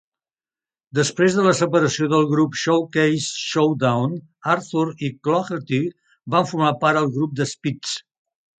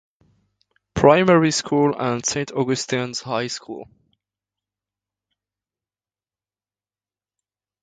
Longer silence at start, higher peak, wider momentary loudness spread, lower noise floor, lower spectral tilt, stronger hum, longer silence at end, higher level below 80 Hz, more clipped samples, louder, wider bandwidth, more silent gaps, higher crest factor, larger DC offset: about the same, 0.95 s vs 0.95 s; about the same, -2 dBFS vs 0 dBFS; second, 9 LU vs 16 LU; about the same, under -90 dBFS vs under -90 dBFS; about the same, -5 dB/octave vs -4.5 dB/octave; second, none vs 50 Hz at -70 dBFS; second, 0.6 s vs 4 s; second, -64 dBFS vs -52 dBFS; neither; about the same, -20 LUFS vs -19 LUFS; about the same, 9.4 kHz vs 9.4 kHz; neither; second, 18 dB vs 24 dB; neither